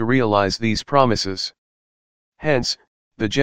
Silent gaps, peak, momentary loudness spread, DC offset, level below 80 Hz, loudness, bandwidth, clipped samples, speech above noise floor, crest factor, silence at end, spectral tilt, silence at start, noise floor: 1.58-2.32 s, 2.87-3.11 s; 0 dBFS; 10 LU; under 0.1%; -46 dBFS; -20 LUFS; 16 kHz; under 0.1%; over 71 dB; 20 dB; 0 s; -5 dB/octave; 0 s; under -90 dBFS